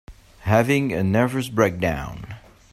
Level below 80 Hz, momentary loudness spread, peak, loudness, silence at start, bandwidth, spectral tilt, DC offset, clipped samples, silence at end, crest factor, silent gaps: -44 dBFS; 18 LU; -4 dBFS; -21 LUFS; 0.1 s; 15.5 kHz; -6.5 dB/octave; under 0.1%; under 0.1%; 0.35 s; 20 dB; none